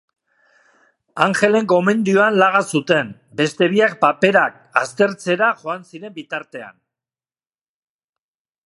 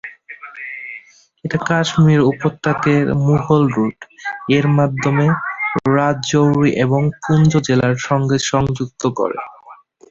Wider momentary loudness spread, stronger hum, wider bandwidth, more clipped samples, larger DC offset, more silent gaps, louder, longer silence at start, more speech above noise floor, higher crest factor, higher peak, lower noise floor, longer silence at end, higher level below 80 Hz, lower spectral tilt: about the same, 14 LU vs 15 LU; neither; first, 11.5 kHz vs 7.8 kHz; neither; neither; neither; about the same, -17 LUFS vs -16 LUFS; first, 1.15 s vs 0.05 s; first, over 73 dB vs 28 dB; about the same, 18 dB vs 14 dB; about the same, 0 dBFS vs -2 dBFS; first, under -90 dBFS vs -43 dBFS; first, 1.95 s vs 0.35 s; second, -70 dBFS vs -46 dBFS; second, -5 dB/octave vs -6.5 dB/octave